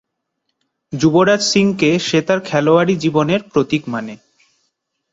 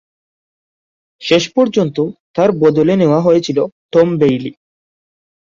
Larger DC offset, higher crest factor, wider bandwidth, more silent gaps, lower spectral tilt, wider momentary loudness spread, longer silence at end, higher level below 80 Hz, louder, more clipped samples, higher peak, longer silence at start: neither; about the same, 16 dB vs 14 dB; about the same, 8 kHz vs 7.6 kHz; second, none vs 2.20-2.34 s, 3.72-3.89 s; second, -5 dB/octave vs -6.5 dB/octave; about the same, 10 LU vs 9 LU; about the same, 0.95 s vs 0.95 s; about the same, -54 dBFS vs -54 dBFS; about the same, -15 LUFS vs -14 LUFS; neither; about the same, -2 dBFS vs 0 dBFS; second, 0.9 s vs 1.2 s